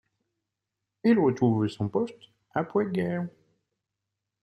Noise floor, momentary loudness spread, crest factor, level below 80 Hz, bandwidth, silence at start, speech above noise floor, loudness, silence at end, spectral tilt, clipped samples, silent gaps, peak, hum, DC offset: -86 dBFS; 11 LU; 18 dB; -68 dBFS; 11.5 kHz; 1.05 s; 60 dB; -27 LUFS; 1.15 s; -8.5 dB/octave; under 0.1%; none; -10 dBFS; none; under 0.1%